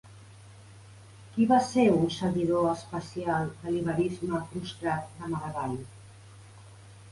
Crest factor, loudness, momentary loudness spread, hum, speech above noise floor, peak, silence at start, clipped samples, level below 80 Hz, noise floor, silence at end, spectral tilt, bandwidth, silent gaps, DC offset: 20 dB; -29 LUFS; 13 LU; none; 23 dB; -10 dBFS; 0.05 s; under 0.1%; -58 dBFS; -50 dBFS; 0 s; -6.5 dB/octave; 11.5 kHz; none; under 0.1%